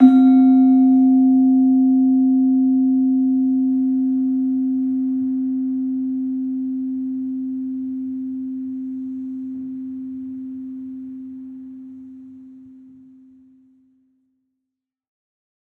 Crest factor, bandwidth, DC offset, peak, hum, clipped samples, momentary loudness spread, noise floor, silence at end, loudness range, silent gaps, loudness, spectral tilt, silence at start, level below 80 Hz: 18 dB; 4.1 kHz; under 0.1%; -2 dBFS; none; under 0.1%; 20 LU; -82 dBFS; 2.95 s; 20 LU; none; -18 LUFS; -9.5 dB/octave; 0 s; -70 dBFS